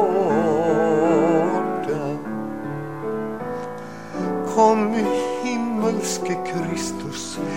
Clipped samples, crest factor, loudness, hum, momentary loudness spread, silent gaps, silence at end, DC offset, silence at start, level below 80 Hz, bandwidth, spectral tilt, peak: under 0.1%; 18 dB; -22 LUFS; none; 12 LU; none; 0 s; 0.6%; 0 s; -58 dBFS; 16 kHz; -5.5 dB/octave; -4 dBFS